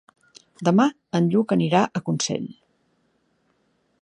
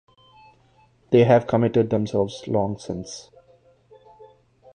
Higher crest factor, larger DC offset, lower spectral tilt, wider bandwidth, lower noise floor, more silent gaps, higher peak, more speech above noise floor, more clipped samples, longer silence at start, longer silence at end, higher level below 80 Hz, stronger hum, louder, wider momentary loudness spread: about the same, 20 dB vs 20 dB; neither; second, -5.5 dB/octave vs -7 dB/octave; about the same, 10.5 kHz vs 9.8 kHz; first, -67 dBFS vs -58 dBFS; neither; about the same, -4 dBFS vs -4 dBFS; first, 47 dB vs 38 dB; neither; second, 0.6 s vs 1.1 s; about the same, 1.5 s vs 1.55 s; second, -68 dBFS vs -56 dBFS; neither; about the same, -22 LUFS vs -21 LUFS; second, 7 LU vs 16 LU